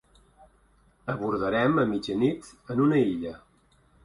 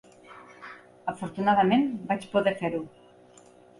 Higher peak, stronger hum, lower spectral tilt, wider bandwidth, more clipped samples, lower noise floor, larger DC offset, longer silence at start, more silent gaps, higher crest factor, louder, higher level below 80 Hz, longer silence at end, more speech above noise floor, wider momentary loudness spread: about the same, -12 dBFS vs -10 dBFS; neither; about the same, -7.5 dB/octave vs -6.5 dB/octave; about the same, 11.5 kHz vs 11.5 kHz; neither; first, -63 dBFS vs -54 dBFS; neither; first, 1.05 s vs 0.3 s; neither; about the same, 16 dB vs 18 dB; about the same, -26 LUFS vs -27 LUFS; first, -58 dBFS vs -68 dBFS; second, 0.65 s vs 0.9 s; first, 37 dB vs 29 dB; second, 14 LU vs 23 LU